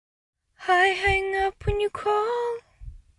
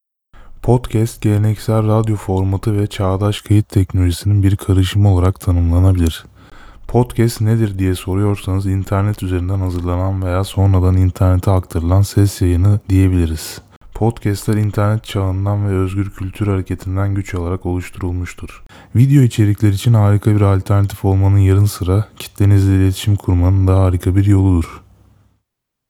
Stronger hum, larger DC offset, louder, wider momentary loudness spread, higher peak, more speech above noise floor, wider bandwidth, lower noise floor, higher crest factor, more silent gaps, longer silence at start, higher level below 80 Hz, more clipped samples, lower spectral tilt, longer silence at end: neither; neither; second, -24 LUFS vs -15 LUFS; first, 11 LU vs 8 LU; second, -8 dBFS vs 0 dBFS; second, 20 dB vs 61 dB; second, 11.5 kHz vs 14.5 kHz; second, -44 dBFS vs -75 dBFS; about the same, 18 dB vs 14 dB; second, none vs 13.76-13.81 s; first, 0.6 s vs 0.4 s; second, -42 dBFS vs -36 dBFS; neither; second, -4.5 dB/octave vs -7.5 dB/octave; second, 0.2 s vs 1.1 s